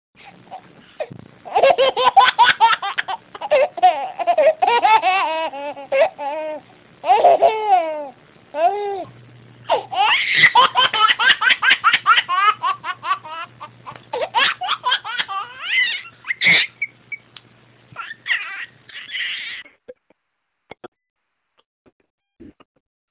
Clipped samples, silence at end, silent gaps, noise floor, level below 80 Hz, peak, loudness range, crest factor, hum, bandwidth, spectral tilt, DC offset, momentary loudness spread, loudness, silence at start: under 0.1%; 0.65 s; 20.88-20.92 s, 21.10-21.16 s, 21.66-21.85 s, 21.92-22.00 s, 22.10-22.18 s; -75 dBFS; -64 dBFS; 0 dBFS; 13 LU; 18 dB; none; 4 kHz; -5 dB/octave; under 0.1%; 19 LU; -16 LUFS; 0.25 s